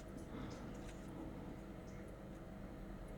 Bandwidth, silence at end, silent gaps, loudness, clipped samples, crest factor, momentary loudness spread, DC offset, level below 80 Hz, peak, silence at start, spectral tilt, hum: 19 kHz; 0 s; none; -52 LUFS; under 0.1%; 14 dB; 3 LU; under 0.1%; -56 dBFS; -38 dBFS; 0 s; -6.5 dB/octave; 50 Hz at -60 dBFS